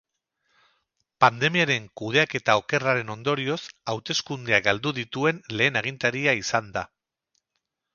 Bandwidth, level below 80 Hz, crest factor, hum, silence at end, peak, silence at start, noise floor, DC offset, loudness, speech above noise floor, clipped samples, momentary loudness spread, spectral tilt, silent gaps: 7.2 kHz; -62 dBFS; 24 dB; none; 1.1 s; -2 dBFS; 1.2 s; -80 dBFS; under 0.1%; -24 LUFS; 56 dB; under 0.1%; 9 LU; -4 dB/octave; none